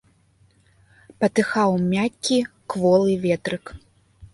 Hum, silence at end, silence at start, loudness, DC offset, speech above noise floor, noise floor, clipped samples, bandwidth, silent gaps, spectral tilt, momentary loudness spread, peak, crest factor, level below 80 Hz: none; 0.1 s; 1.2 s; -21 LUFS; under 0.1%; 39 dB; -59 dBFS; under 0.1%; 11.5 kHz; none; -5.5 dB/octave; 11 LU; -6 dBFS; 18 dB; -54 dBFS